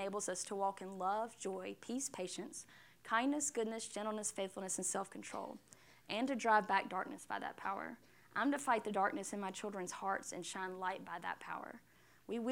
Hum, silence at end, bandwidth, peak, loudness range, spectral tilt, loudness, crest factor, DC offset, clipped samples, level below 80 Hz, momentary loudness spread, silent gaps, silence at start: none; 0 s; 16.5 kHz; -20 dBFS; 4 LU; -3 dB/octave; -40 LUFS; 22 dB; under 0.1%; under 0.1%; -82 dBFS; 12 LU; none; 0 s